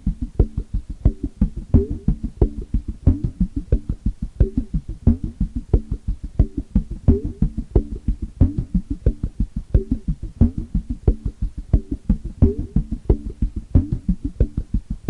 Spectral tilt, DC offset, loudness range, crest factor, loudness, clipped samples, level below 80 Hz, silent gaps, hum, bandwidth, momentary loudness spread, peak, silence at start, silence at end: -11 dB/octave; under 0.1%; 1 LU; 18 dB; -23 LUFS; under 0.1%; -24 dBFS; none; none; 2.7 kHz; 8 LU; -2 dBFS; 0.05 s; 0 s